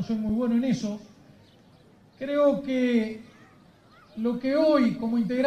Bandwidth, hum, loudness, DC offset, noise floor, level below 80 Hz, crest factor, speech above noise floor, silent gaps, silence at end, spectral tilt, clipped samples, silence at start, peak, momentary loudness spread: 9 kHz; none; -25 LUFS; under 0.1%; -56 dBFS; -58 dBFS; 16 dB; 31 dB; none; 0 s; -7 dB/octave; under 0.1%; 0 s; -10 dBFS; 14 LU